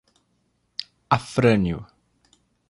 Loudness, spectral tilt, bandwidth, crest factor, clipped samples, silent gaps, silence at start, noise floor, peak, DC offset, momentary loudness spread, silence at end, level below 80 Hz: -23 LUFS; -6.5 dB/octave; 11.5 kHz; 22 dB; under 0.1%; none; 0.8 s; -69 dBFS; -4 dBFS; under 0.1%; 16 LU; 0.85 s; -48 dBFS